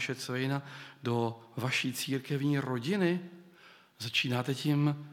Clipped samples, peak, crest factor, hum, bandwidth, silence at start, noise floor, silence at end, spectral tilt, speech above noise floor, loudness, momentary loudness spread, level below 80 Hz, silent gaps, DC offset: under 0.1%; -16 dBFS; 18 dB; none; 16.5 kHz; 0 s; -58 dBFS; 0 s; -5.5 dB/octave; 26 dB; -32 LUFS; 8 LU; -82 dBFS; none; under 0.1%